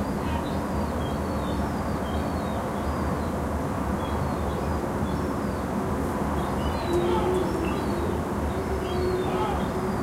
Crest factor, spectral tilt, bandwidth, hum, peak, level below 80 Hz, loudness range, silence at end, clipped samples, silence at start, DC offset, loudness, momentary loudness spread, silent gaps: 14 dB; -6.5 dB/octave; 16 kHz; none; -12 dBFS; -36 dBFS; 2 LU; 0 s; under 0.1%; 0 s; under 0.1%; -27 LUFS; 3 LU; none